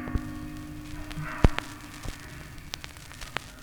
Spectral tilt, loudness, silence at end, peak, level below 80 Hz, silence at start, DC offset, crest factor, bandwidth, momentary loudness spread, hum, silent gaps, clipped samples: -5.5 dB/octave; -34 LUFS; 0 s; 0 dBFS; -34 dBFS; 0 s; under 0.1%; 32 dB; over 20 kHz; 16 LU; none; none; under 0.1%